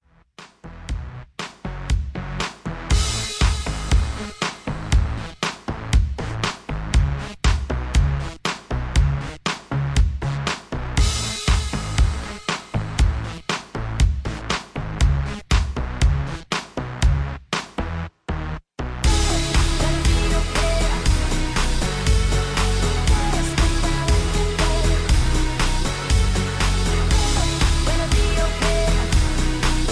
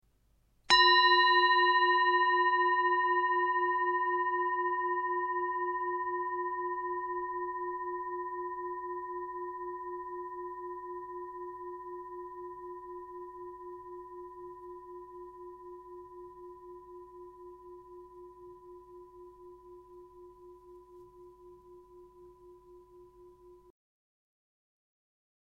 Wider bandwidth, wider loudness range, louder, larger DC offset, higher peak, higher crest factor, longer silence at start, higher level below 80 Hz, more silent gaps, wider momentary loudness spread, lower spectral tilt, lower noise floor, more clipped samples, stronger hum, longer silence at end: first, 11 kHz vs 9.2 kHz; second, 4 LU vs 26 LU; first, -22 LUFS vs -29 LUFS; neither; first, -6 dBFS vs -10 dBFS; second, 14 dB vs 24 dB; second, 0.4 s vs 0.7 s; first, -22 dBFS vs -68 dBFS; neither; second, 9 LU vs 26 LU; first, -4.5 dB/octave vs -2 dB/octave; second, -47 dBFS vs -70 dBFS; neither; neither; second, 0 s vs 1.95 s